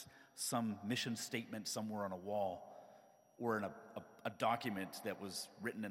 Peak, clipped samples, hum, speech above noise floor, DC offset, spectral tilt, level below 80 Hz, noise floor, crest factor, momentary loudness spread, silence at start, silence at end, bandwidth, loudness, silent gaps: -24 dBFS; under 0.1%; none; 23 dB; under 0.1%; -4 dB/octave; -88 dBFS; -66 dBFS; 20 dB; 14 LU; 0 s; 0 s; 16.5 kHz; -42 LUFS; none